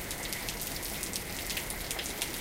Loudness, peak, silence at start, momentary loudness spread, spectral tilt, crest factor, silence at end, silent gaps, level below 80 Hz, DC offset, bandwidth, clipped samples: -34 LUFS; -10 dBFS; 0 s; 1 LU; -1.5 dB/octave; 28 dB; 0 s; none; -48 dBFS; under 0.1%; 16.5 kHz; under 0.1%